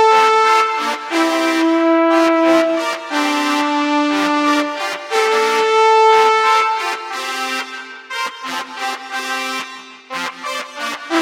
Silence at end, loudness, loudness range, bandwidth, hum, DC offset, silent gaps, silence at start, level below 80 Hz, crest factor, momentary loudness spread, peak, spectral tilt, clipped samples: 0 s; -16 LUFS; 9 LU; 16.5 kHz; none; under 0.1%; none; 0 s; -70 dBFS; 16 dB; 13 LU; 0 dBFS; -1.5 dB/octave; under 0.1%